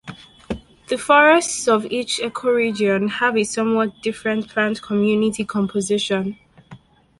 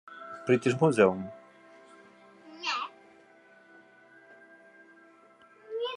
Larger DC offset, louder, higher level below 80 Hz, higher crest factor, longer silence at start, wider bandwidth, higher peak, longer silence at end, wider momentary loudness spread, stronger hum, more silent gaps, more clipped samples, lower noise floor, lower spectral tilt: neither; first, -19 LUFS vs -28 LUFS; first, -54 dBFS vs -80 dBFS; second, 18 dB vs 24 dB; about the same, 0.05 s vs 0.1 s; about the same, 11.5 kHz vs 11 kHz; first, -2 dBFS vs -8 dBFS; first, 0.45 s vs 0 s; second, 13 LU vs 21 LU; neither; neither; neither; second, -45 dBFS vs -58 dBFS; second, -4 dB/octave vs -6 dB/octave